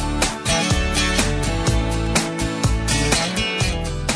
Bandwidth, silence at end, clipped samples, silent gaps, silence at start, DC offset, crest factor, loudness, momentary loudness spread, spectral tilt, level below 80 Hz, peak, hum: 11 kHz; 0 s; under 0.1%; none; 0 s; under 0.1%; 14 dB; -20 LUFS; 4 LU; -3.5 dB/octave; -26 dBFS; -6 dBFS; none